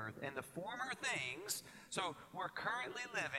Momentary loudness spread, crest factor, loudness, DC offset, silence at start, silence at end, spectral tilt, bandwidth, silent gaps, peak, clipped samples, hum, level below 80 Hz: 7 LU; 20 dB; -43 LUFS; under 0.1%; 0 s; 0 s; -2 dB/octave; 16 kHz; none; -24 dBFS; under 0.1%; none; -78 dBFS